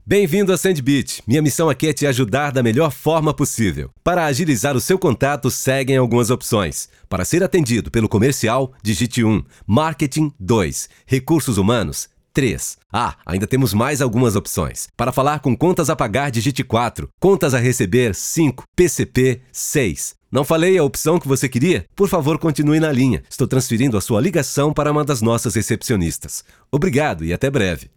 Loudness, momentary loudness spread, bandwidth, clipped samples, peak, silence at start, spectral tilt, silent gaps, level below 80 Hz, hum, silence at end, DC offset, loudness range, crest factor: -18 LUFS; 6 LU; 19.5 kHz; under 0.1%; -2 dBFS; 0.05 s; -5.5 dB/octave; 12.86-12.90 s, 17.14-17.18 s, 18.68-18.73 s; -40 dBFS; none; 0.15 s; 0.2%; 2 LU; 16 dB